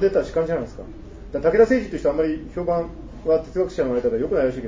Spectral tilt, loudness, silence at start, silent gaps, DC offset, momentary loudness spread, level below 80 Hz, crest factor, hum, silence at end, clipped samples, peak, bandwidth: -7.5 dB/octave; -22 LUFS; 0 s; none; under 0.1%; 16 LU; -40 dBFS; 16 dB; none; 0 s; under 0.1%; -4 dBFS; 7.6 kHz